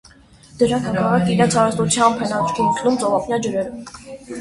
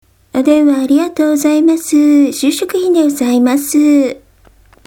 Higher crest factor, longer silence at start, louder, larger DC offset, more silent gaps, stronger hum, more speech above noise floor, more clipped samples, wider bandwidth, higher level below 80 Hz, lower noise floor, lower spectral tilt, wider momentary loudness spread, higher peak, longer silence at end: first, 18 dB vs 12 dB; first, 0.55 s vs 0.35 s; second, -18 LUFS vs -11 LUFS; neither; neither; neither; second, 28 dB vs 35 dB; neither; second, 11.5 kHz vs 18 kHz; about the same, -50 dBFS vs -52 dBFS; about the same, -47 dBFS vs -46 dBFS; first, -5 dB/octave vs -3.5 dB/octave; first, 14 LU vs 5 LU; about the same, -2 dBFS vs 0 dBFS; second, 0 s vs 0.7 s